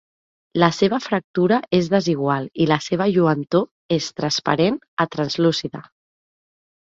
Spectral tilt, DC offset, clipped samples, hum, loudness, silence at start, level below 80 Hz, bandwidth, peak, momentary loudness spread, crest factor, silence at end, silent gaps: -5.5 dB/octave; under 0.1%; under 0.1%; none; -20 LUFS; 0.55 s; -58 dBFS; 7.8 kHz; 0 dBFS; 6 LU; 20 dB; 1.05 s; 1.24-1.34 s, 3.71-3.89 s, 4.88-4.97 s